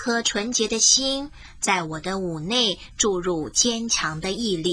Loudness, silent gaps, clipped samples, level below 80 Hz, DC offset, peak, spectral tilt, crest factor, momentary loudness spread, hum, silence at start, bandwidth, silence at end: -22 LUFS; none; under 0.1%; -48 dBFS; under 0.1%; -4 dBFS; -2 dB/octave; 18 dB; 11 LU; none; 0 s; 10.5 kHz; 0 s